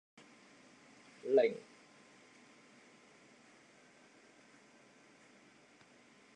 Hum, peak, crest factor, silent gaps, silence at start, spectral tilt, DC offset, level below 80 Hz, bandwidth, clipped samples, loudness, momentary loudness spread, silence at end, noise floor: none; -18 dBFS; 26 dB; none; 1.25 s; -5 dB/octave; under 0.1%; under -90 dBFS; 10 kHz; under 0.1%; -34 LUFS; 29 LU; 4.75 s; -64 dBFS